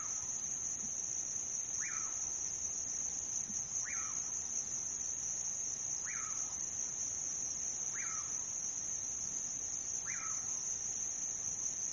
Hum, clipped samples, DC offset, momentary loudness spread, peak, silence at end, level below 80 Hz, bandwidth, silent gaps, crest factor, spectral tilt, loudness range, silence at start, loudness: none; under 0.1%; under 0.1%; 1 LU; -26 dBFS; 0 s; -68 dBFS; 11.5 kHz; none; 14 dB; 0 dB/octave; 0 LU; 0 s; -37 LUFS